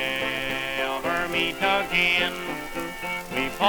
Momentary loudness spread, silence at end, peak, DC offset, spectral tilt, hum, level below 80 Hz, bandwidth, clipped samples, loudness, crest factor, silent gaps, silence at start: 11 LU; 0 s; -6 dBFS; under 0.1%; -3 dB/octave; none; -48 dBFS; over 20 kHz; under 0.1%; -25 LUFS; 20 dB; none; 0 s